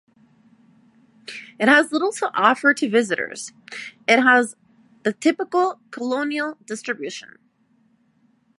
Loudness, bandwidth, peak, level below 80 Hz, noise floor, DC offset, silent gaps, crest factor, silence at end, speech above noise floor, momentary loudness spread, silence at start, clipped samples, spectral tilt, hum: -20 LUFS; 11.5 kHz; -2 dBFS; -76 dBFS; -62 dBFS; under 0.1%; none; 20 dB; 1.35 s; 41 dB; 19 LU; 1.3 s; under 0.1%; -3.5 dB/octave; none